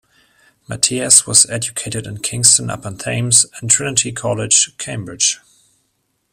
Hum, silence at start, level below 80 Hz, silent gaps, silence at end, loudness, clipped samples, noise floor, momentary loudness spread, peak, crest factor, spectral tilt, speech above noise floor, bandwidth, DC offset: none; 0.7 s; -52 dBFS; none; 0.95 s; -13 LUFS; 0.1%; -67 dBFS; 15 LU; 0 dBFS; 18 dB; -1.5 dB/octave; 51 dB; over 20 kHz; under 0.1%